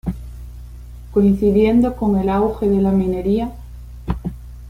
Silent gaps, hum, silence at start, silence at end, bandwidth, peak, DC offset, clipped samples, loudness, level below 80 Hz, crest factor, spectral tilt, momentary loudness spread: none; 60 Hz at -30 dBFS; 0.05 s; 0 s; 11 kHz; -4 dBFS; under 0.1%; under 0.1%; -18 LUFS; -32 dBFS; 14 dB; -9.5 dB/octave; 23 LU